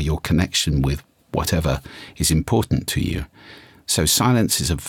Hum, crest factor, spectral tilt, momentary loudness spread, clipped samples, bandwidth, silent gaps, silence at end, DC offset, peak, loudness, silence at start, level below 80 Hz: none; 16 dB; -4 dB/octave; 13 LU; under 0.1%; 18.5 kHz; none; 0 s; under 0.1%; -4 dBFS; -20 LUFS; 0 s; -34 dBFS